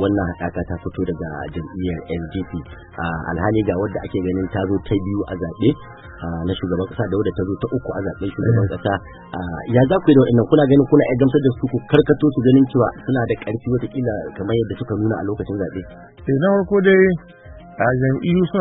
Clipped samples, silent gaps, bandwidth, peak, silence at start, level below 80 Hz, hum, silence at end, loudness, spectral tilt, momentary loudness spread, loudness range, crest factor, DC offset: under 0.1%; none; 4 kHz; 0 dBFS; 0 s; -42 dBFS; none; 0 s; -19 LUFS; -11.5 dB/octave; 14 LU; 8 LU; 18 dB; under 0.1%